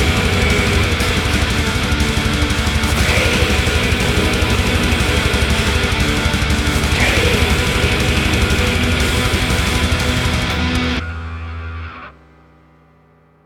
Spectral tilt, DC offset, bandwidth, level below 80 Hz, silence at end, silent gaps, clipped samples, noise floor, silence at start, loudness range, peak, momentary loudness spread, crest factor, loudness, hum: -4.5 dB/octave; under 0.1%; 18 kHz; -22 dBFS; 1.35 s; none; under 0.1%; -51 dBFS; 0 s; 4 LU; -2 dBFS; 5 LU; 14 dB; -15 LUFS; none